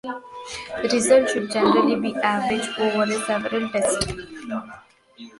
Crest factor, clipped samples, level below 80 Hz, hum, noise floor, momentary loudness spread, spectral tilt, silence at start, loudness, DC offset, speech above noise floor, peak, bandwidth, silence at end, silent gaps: 18 dB; under 0.1%; -50 dBFS; none; -45 dBFS; 16 LU; -3.5 dB/octave; 0.05 s; -22 LUFS; under 0.1%; 23 dB; -4 dBFS; 11.5 kHz; 0.1 s; none